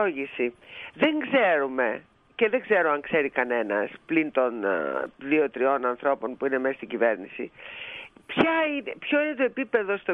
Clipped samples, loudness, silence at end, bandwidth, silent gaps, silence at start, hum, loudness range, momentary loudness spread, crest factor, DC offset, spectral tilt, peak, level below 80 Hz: under 0.1%; -25 LUFS; 0 s; 5.6 kHz; none; 0 s; none; 2 LU; 14 LU; 18 dB; under 0.1%; -7 dB/octave; -8 dBFS; -68 dBFS